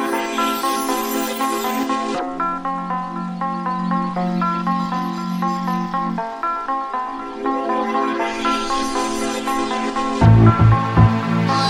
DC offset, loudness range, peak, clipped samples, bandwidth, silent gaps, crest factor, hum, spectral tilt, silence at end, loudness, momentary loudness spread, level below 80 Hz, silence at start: under 0.1%; 6 LU; 0 dBFS; under 0.1%; 16.5 kHz; none; 18 dB; none; -6 dB/octave; 0 s; -20 LUFS; 9 LU; -36 dBFS; 0 s